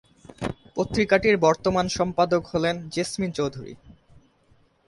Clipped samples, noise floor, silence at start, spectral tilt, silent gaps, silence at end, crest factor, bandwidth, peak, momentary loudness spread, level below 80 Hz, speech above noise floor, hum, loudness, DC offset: under 0.1%; -61 dBFS; 0.4 s; -5 dB/octave; none; 0.95 s; 20 dB; 11.5 kHz; -6 dBFS; 14 LU; -50 dBFS; 38 dB; none; -24 LUFS; under 0.1%